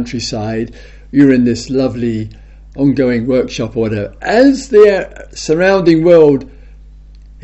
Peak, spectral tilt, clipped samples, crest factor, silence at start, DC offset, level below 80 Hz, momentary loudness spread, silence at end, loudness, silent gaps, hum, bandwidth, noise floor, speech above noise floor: 0 dBFS; -6.5 dB/octave; 0.2%; 12 dB; 0 s; under 0.1%; -36 dBFS; 14 LU; 0.55 s; -12 LUFS; none; none; 8.2 kHz; -36 dBFS; 24 dB